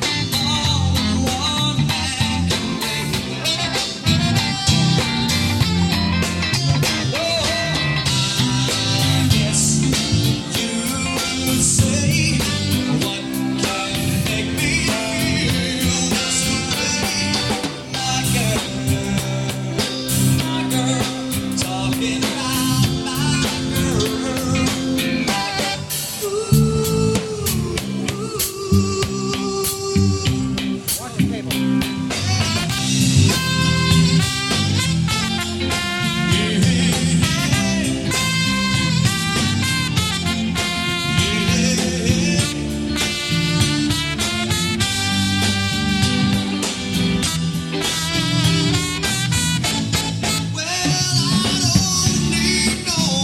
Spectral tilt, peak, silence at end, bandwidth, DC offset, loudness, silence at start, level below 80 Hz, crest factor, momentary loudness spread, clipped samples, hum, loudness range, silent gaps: -4 dB/octave; 0 dBFS; 0 s; 17 kHz; under 0.1%; -18 LUFS; 0 s; -36 dBFS; 18 dB; 5 LU; under 0.1%; none; 3 LU; none